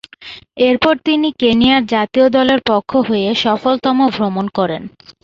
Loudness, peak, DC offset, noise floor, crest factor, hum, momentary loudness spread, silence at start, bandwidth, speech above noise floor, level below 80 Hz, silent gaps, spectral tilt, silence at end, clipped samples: -14 LUFS; -2 dBFS; under 0.1%; -36 dBFS; 14 dB; none; 10 LU; 0.2 s; 7.4 kHz; 23 dB; -48 dBFS; none; -6 dB/octave; 0.35 s; under 0.1%